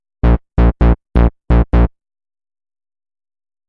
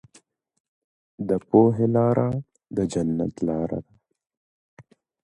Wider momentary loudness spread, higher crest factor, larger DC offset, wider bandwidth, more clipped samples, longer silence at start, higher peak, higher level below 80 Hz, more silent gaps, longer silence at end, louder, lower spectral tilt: second, 3 LU vs 14 LU; second, 12 dB vs 20 dB; neither; second, 4.2 kHz vs 11 kHz; neither; second, 0.25 s vs 1.2 s; about the same, -2 dBFS vs -4 dBFS; first, -16 dBFS vs -54 dBFS; second, none vs 4.37-4.77 s; first, 1.8 s vs 0.4 s; first, -15 LUFS vs -23 LUFS; first, -10.5 dB/octave vs -9 dB/octave